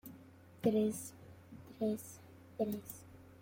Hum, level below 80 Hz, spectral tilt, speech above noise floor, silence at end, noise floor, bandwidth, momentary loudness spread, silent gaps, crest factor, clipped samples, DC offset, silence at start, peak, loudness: none; -74 dBFS; -6.5 dB/octave; 22 dB; 0 s; -58 dBFS; 16.5 kHz; 24 LU; none; 20 dB; under 0.1%; under 0.1%; 0.05 s; -20 dBFS; -38 LUFS